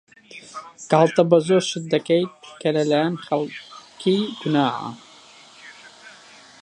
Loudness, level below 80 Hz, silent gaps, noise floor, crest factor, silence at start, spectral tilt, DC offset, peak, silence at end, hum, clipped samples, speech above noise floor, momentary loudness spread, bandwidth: -21 LUFS; -72 dBFS; none; -48 dBFS; 20 dB; 0.35 s; -5.5 dB/octave; under 0.1%; -2 dBFS; 0.5 s; none; under 0.1%; 27 dB; 25 LU; 10.5 kHz